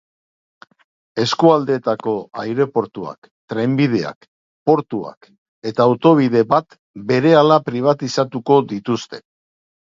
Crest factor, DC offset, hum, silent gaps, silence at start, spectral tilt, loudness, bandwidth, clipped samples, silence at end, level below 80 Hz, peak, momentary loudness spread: 18 dB; under 0.1%; none; 3.18-3.22 s, 3.31-3.48 s, 4.16-4.21 s, 4.28-4.66 s, 5.17-5.21 s, 5.38-5.62 s, 6.79-6.94 s; 1.15 s; -6.5 dB/octave; -17 LUFS; 7.6 kHz; under 0.1%; 0.75 s; -62 dBFS; 0 dBFS; 16 LU